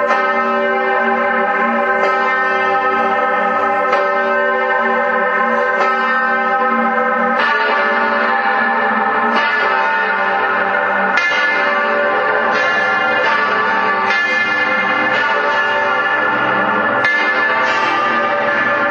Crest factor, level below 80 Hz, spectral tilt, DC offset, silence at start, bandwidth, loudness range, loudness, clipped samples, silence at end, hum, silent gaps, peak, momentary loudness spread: 14 dB; -62 dBFS; -4 dB/octave; under 0.1%; 0 s; 8.4 kHz; 1 LU; -14 LUFS; under 0.1%; 0 s; none; none; 0 dBFS; 1 LU